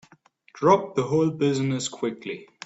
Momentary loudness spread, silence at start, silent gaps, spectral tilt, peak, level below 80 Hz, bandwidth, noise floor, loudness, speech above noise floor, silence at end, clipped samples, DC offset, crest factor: 11 LU; 0.55 s; none; -6 dB/octave; -4 dBFS; -64 dBFS; 8.2 kHz; -58 dBFS; -24 LUFS; 34 dB; 0.2 s; under 0.1%; under 0.1%; 20 dB